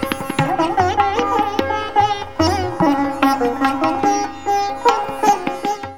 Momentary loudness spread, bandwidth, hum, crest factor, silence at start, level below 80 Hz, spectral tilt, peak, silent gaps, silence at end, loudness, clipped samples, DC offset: 3 LU; 18 kHz; none; 18 dB; 0 s; -44 dBFS; -5 dB/octave; 0 dBFS; none; 0 s; -18 LUFS; under 0.1%; 1%